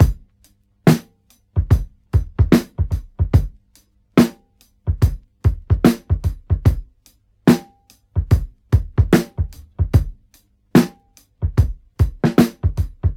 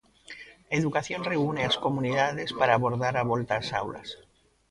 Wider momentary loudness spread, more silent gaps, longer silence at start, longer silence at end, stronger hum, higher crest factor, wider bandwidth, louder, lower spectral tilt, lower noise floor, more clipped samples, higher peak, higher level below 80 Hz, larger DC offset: second, 10 LU vs 20 LU; neither; second, 0 s vs 0.3 s; second, 0 s vs 0.55 s; neither; about the same, 18 dB vs 22 dB; first, 17 kHz vs 11.5 kHz; first, -19 LUFS vs -27 LUFS; first, -7.5 dB/octave vs -5.5 dB/octave; first, -57 dBFS vs -48 dBFS; neither; first, 0 dBFS vs -6 dBFS; first, -26 dBFS vs -58 dBFS; neither